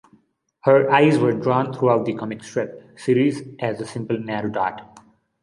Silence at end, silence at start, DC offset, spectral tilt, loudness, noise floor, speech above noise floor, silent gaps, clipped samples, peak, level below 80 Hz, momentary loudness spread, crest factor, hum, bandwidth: 0.45 s; 0.65 s; under 0.1%; -7 dB/octave; -21 LUFS; -59 dBFS; 39 dB; none; under 0.1%; -2 dBFS; -64 dBFS; 13 LU; 20 dB; none; 11.5 kHz